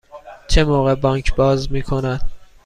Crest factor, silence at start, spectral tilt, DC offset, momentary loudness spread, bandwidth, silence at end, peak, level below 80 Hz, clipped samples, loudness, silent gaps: 14 dB; 0.15 s; -6 dB/octave; under 0.1%; 11 LU; 10.5 kHz; 0.2 s; -2 dBFS; -24 dBFS; under 0.1%; -18 LUFS; none